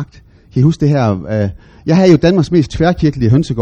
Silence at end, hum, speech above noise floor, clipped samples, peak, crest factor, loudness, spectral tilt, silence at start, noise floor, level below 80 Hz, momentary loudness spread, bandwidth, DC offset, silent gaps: 0 s; none; 30 dB; 0.1%; 0 dBFS; 12 dB; -13 LUFS; -8 dB/octave; 0 s; -42 dBFS; -34 dBFS; 12 LU; 8.8 kHz; under 0.1%; none